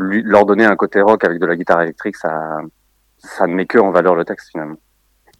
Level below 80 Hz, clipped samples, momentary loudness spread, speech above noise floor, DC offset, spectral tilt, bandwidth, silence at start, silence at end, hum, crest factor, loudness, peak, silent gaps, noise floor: -56 dBFS; 0.1%; 15 LU; 41 dB; under 0.1%; -7 dB/octave; 12 kHz; 0 s; 0.65 s; none; 16 dB; -14 LUFS; 0 dBFS; none; -56 dBFS